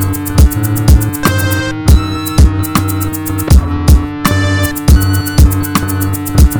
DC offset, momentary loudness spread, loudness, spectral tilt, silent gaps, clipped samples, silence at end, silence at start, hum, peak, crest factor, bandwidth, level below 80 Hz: under 0.1%; 5 LU; -12 LUFS; -5.5 dB/octave; none; 3%; 0 s; 0 s; none; 0 dBFS; 10 dB; over 20 kHz; -12 dBFS